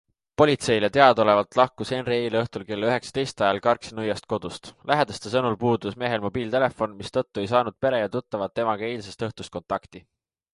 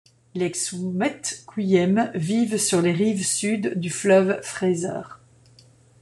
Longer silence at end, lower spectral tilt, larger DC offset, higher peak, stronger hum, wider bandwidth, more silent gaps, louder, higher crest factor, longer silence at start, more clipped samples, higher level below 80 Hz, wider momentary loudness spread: second, 0.55 s vs 0.85 s; about the same, -5.5 dB/octave vs -4.5 dB/octave; neither; about the same, -2 dBFS vs -4 dBFS; neither; about the same, 11.5 kHz vs 12.5 kHz; neither; about the same, -24 LUFS vs -22 LUFS; about the same, 22 dB vs 18 dB; about the same, 0.4 s vs 0.35 s; neither; first, -56 dBFS vs -66 dBFS; about the same, 12 LU vs 11 LU